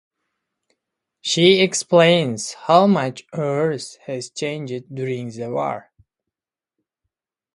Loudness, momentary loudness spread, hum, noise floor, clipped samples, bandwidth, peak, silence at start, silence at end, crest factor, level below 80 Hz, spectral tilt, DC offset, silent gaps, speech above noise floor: -19 LUFS; 15 LU; none; -88 dBFS; under 0.1%; 11.5 kHz; 0 dBFS; 1.25 s; 1.75 s; 20 dB; -66 dBFS; -4.5 dB/octave; under 0.1%; none; 69 dB